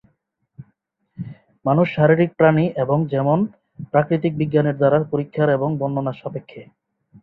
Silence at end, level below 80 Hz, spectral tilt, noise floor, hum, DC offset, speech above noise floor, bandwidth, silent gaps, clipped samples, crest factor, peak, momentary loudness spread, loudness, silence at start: 0.6 s; -58 dBFS; -11 dB/octave; -69 dBFS; none; under 0.1%; 50 dB; 4.6 kHz; none; under 0.1%; 18 dB; -2 dBFS; 17 LU; -19 LUFS; 0.6 s